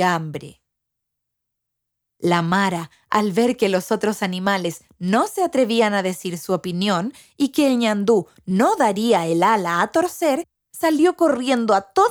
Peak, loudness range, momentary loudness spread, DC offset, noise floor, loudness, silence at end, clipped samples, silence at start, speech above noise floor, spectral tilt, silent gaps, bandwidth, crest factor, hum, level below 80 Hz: -2 dBFS; 4 LU; 8 LU; under 0.1%; -80 dBFS; -20 LUFS; 0 s; under 0.1%; 0 s; 60 dB; -5 dB/octave; none; over 20 kHz; 18 dB; none; -64 dBFS